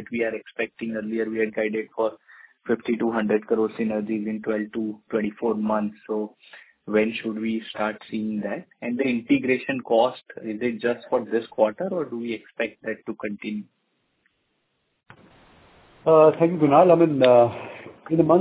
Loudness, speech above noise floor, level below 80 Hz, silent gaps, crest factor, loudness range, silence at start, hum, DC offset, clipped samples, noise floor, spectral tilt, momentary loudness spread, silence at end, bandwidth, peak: -23 LUFS; 50 dB; -64 dBFS; none; 22 dB; 10 LU; 0 s; none; under 0.1%; under 0.1%; -73 dBFS; -10.5 dB/octave; 15 LU; 0 s; 4 kHz; -2 dBFS